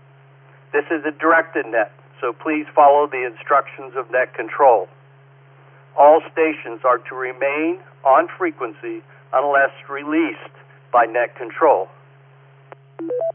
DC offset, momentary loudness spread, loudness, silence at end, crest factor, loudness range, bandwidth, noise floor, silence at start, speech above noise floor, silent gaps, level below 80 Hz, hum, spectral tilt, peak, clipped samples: under 0.1%; 15 LU; -18 LUFS; 0.05 s; 18 dB; 3 LU; 3.5 kHz; -48 dBFS; 0.75 s; 30 dB; none; under -90 dBFS; none; -10 dB/octave; -2 dBFS; under 0.1%